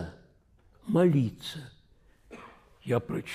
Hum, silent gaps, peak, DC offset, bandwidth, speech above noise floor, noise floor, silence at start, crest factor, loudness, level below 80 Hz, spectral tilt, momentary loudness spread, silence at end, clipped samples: none; none; -14 dBFS; under 0.1%; 15 kHz; 35 dB; -62 dBFS; 0 s; 18 dB; -28 LUFS; -60 dBFS; -7.5 dB/octave; 25 LU; 0 s; under 0.1%